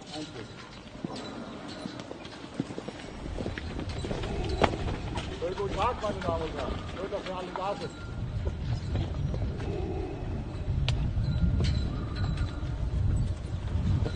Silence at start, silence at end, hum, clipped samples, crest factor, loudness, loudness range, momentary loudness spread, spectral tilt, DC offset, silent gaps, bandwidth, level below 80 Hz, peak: 0 s; 0 s; none; under 0.1%; 30 dB; -33 LUFS; 7 LU; 11 LU; -6.5 dB/octave; under 0.1%; none; 9.6 kHz; -36 dBFS; -2 dBFS